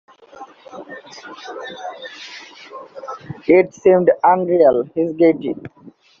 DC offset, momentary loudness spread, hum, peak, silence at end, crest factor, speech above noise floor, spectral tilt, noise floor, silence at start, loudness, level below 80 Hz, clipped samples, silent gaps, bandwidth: under 0.1%; 22 LU; none; -2 dBFS; 0.55 s; 18 dB; 23 dB; -5.5 dB/octave; -41 dBFS; 0.4 s; -15 LUFS; -62 dBFS; under 0.1%; none; 7 kHz